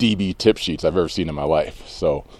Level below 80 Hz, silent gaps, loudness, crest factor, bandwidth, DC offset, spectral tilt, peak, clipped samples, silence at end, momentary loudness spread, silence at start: -40 dBFS; none; -21 LUFS; 20 dB; 13 kHz; under 0.1%; -5.5 dB/octave; -2 dBFS; under 0.1%; 0.05 s; 5 LU; 0 s